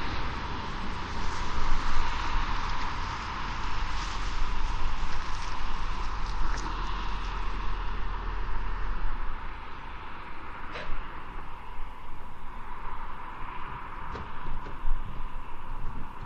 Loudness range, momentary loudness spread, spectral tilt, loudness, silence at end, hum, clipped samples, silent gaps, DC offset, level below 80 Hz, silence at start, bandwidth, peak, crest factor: 8 LU; 10 LU; -4.5 dB/octave; -36 LUFS; 0 s; none; under 0.1%; none; under 0.1%; -32 dBFS; 0 s; 7.2 kHz; -10 dBFS; 16 dB